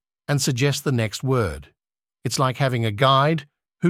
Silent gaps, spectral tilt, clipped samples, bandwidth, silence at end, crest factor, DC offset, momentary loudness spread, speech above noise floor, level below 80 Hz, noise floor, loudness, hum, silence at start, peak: none; -5 dB/octave; under 0.1%; 16 kHz; 0 s; 20 dB; under 0.1%; 11 LU; 67 dB; -48 dBFS; -88 dBFS; -21 LUFS; none; 0.3 s; -2 dBFS